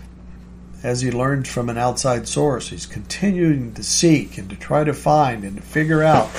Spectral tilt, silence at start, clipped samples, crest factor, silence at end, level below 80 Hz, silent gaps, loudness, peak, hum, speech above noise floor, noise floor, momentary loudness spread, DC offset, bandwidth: -5 dB/octave; 0 s; under 0.1%; 18 dB; 0 s; -40 dBFS; none; -19 LUFS; -2 dBFS; none; 20 dB; -39 dBFS; 14 LU; under 0.1%; 15.5 kHz